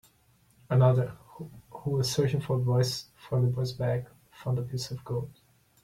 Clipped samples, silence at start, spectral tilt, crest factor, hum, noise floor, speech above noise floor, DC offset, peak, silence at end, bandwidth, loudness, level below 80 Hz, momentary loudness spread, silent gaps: under 0.1%; 0.7 s; -6.5 dB/octave; 18 dB; none; -64 dBFS; 37 dB; under 0.1%; -12 dBFS; 0.55 s; 14.5 kHz; -29 LUFS; -58 dBFS; 20 LU; none